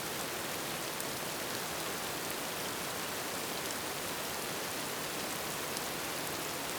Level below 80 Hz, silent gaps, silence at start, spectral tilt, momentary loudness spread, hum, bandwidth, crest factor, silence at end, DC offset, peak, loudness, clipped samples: -64 dBFS; none; 0 s; -2 dB/octave; 0 LU; none; over 20 kHz; 24 dB; 0 s; under 0.1%; -14 dBFS; -36 LUFS; under 0.1%